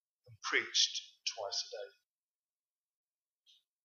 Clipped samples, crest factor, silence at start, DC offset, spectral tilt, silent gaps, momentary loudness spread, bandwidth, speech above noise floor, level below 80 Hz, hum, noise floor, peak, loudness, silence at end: under 0.1%; 26 dB; 0.25 s; under 0.1%; 1 dB/octave; none; 16 LU; 13.5 kHz; over 53 dB; under -90 dBFS; none; under -90 dBFS; -16 dBFS; -35 LUFS; 1.95 s